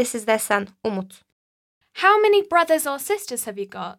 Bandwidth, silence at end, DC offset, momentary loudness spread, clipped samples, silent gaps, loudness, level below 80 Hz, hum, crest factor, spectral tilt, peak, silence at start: 17 kHz; 0.05 s; under 0.1%; 15 LU; under 0.1%; 1.32-1.81 s; -21 LUFS; -70 dBFS; none; 18 dB; -3 dB/octave; -4 dBFS; 0 s